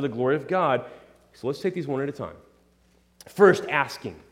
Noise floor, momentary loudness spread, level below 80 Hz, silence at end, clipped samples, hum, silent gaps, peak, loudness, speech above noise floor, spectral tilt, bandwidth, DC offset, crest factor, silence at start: -62 dBFS; 19 LU; -64 dBFS; 0.15 s; under 0.1%; none; none; -4 dBFS; -24 LUFS; 37 dB; -6 dB/octave; 15.5 kHz; under 0.1%; 22 dB; 0 s